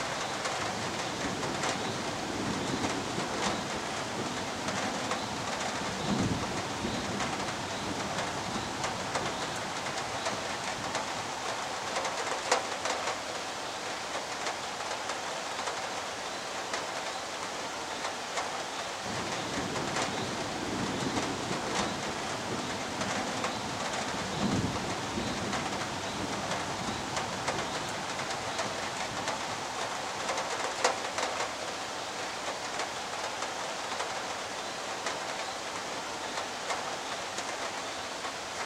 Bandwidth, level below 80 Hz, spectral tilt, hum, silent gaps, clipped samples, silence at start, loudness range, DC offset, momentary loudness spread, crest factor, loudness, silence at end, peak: 16.5 kHz; -60 dBFS; -3 dB/octave; none; none; under 0.1%; 0 s; 2 LU; under 0.1%; 4 LU; 24 dB; -33 LUFS; 0 s; -12 dBFS